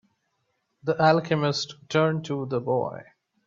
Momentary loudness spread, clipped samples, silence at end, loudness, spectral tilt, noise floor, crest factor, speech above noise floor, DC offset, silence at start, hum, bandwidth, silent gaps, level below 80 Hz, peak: 12 LU; under 0.1%; 0.45 s; -25 LUFS; -6 dB/octave; -75 dBFS; 22 dB; 50 dB; under 0.1%; 0.85 s; none; 7.6 kHz; none; -68 dBFS; -4 dBFS